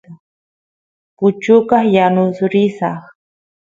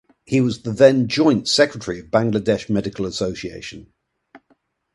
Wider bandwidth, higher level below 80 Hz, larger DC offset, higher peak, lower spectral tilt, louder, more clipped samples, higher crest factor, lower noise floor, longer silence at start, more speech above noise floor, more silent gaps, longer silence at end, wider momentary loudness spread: second, 7.6 kHz vs 11.5 kHz; second, -60 dBFS vs -50 dBFS; neither; about the same, 0 dBFS vs 0 dBFS; first, -8 dB/octave vs -5.5 dB/octave; first, -14 LUFS vs -19 LUFS; neither; about the same, 16 dB vs 20 dB; first, under -90 dBFS vs -63 dBFS; second, 0.1 s vs 0.3 s; first, over 77 dB vs 44 dB; first, 0.20-1.17 s vs none; about the same, 0.6 s vs 0.55 s; second, 11 LU vs 15 LU